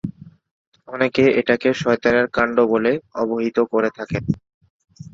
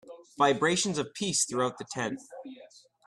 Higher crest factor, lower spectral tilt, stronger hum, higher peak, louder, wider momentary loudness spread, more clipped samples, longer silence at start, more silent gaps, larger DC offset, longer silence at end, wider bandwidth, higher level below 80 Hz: about the same, 18 dB vs 20 dB; first, -6.5 dB/octave vs -3 dB/octave; neither; first, -2 dBFS vs -10 dBFS; first, -19 LUFS vs -28 LUFS; second, 10 LU vs 20 LU; neither; about the same, 0.05 s vs 0.05 s; first, 0.51-0.72 s, 4.54-4.61 s, 4.70-4.80 s vs none; neither; second, 0.05 s vs 0.4 s; second, 7.6 kHz vs 13 kHz; first, -52 dBFS vs -70 dBFS